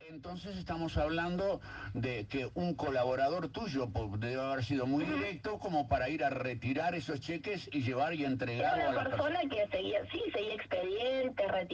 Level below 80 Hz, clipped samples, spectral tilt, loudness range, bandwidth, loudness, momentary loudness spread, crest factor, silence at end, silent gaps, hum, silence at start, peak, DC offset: -54 dBFS; under 0.1%; -6.5 dB/octave; 1 LU; 8.4 kHz; -35 LUFS; 6 LU; 16 dB; 0 s; none; none; 0 s; -18 dBFS; under 0.1%